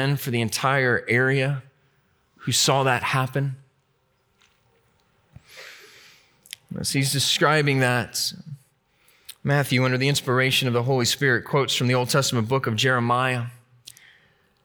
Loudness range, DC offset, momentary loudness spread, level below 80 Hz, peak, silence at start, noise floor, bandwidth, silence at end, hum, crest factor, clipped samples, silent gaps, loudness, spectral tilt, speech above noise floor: 8 LU; under 0.1%; 17 LU; -64 dBFS; -6 dBFS; 0 s; -67 dBFS; over 20 kHz; 1.1 s; none; 18 dB; under 0.1%; none; -22 LUFS; -4 dB/octave; 46 dB